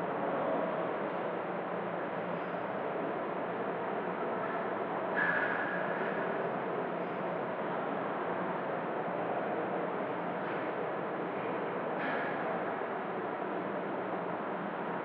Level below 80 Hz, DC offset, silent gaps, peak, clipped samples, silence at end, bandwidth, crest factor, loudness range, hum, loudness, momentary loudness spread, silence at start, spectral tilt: -80 dBFS; under 0.1%; none; -18 dBFS; under 0.1%; 0 s; 5.2 kHz; 16 dB; 2 LU; none; -35 LUFS; 4 LU; 0 s; -4.5 dB/octave